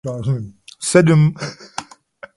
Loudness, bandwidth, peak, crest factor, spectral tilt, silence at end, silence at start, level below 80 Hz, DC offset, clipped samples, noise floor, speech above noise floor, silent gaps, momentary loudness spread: -16 LUFS; 11.5 kHz; 0 dBFS; 18 dB; -6 dB/octave; 0.55 s; 0.05 s; -50 dBFS; under 0.1%; under 0.1%; -42 dBFS; 26 dB; none; 19 LU